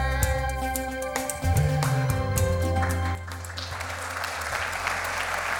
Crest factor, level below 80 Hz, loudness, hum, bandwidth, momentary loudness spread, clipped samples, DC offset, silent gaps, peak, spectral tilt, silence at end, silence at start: 20 dB; -36 dBFS; -27 LUFS; none; 19.5 kHz; 8 LU; under 0.1%; under 0.1%; none; -6 dBFS; -4.5 dB/octave; 0 s; 0 s